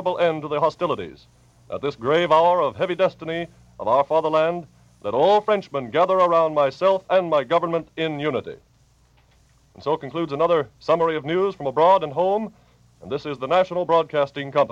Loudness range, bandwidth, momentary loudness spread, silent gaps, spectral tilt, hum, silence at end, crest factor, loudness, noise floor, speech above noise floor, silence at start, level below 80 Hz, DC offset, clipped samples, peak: 5 LU; 8 kHz; 12 LU; none; -6.5 dB/octave; none; 0 s; 18 dB; -21 LUFS; -58 dBFS; 37 dB; 0 s; -60 dBFS; under 0.1%; under 0.1%; -4 dBFS